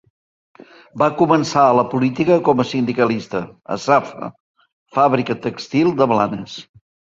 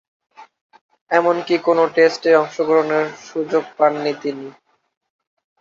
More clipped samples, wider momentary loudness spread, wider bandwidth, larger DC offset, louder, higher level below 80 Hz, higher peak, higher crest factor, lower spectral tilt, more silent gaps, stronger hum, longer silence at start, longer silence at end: neither; first, 15 LU vs 11 LU; about the same, 7.8 kHz vs 7.4 kHz; neither; about the same, -17 LUFS vs -18 LUFS; first, -58 dBFS vs -70 dBFS; about the same, 0 dBFS vs -2 dBFS; about the same, 18 dB vs 18 dB; first, -6.5 dB/octave vs -5 dB/octave; about the same, 4.40-4.54 s, 4.73-4.86 s vs 0.61-0.70 s, 0.81-0.89 s, 1.01-1.06 s; neither; first, 0.95 s vs 0.4 s; second, 0.6 s vs 1.1 s